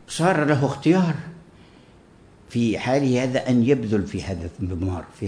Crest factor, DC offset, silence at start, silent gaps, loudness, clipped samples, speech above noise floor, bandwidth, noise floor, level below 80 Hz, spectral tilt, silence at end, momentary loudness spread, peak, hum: 16 dB; under 0.1%; 0.1 s; none; -22 LUFS; under 0.1%; 29 dB; 10.5 kHz; -50 dBFS; -48 dBFS; -6.5 dB/octave; 0 s; 10 LU; -6 dBFS; none